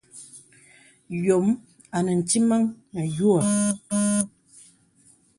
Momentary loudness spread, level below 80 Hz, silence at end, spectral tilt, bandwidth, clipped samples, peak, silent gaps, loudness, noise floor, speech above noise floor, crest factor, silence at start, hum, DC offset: 12 LU; -64 dBFS; 1.1 s; -5.5 dB/octave; 11.5 kHz; under 0.1%; -4 dBFS; none; -23 LUFS; -59 dBFS; 36 dB; 20 dB; 0.15 s; none; under 0.1%